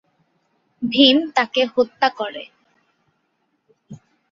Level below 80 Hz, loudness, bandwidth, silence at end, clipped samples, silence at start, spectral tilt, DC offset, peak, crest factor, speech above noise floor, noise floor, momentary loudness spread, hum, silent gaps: -68 dBFS; -18 LUFS; 7.4 kHz; 0.35 s; under 0.1%; 0.8 s; -4 dB/octave; under 0.1%; -2 dBFS; 20 dB; 51 dB; -69 dBFS; 16 LU; none; none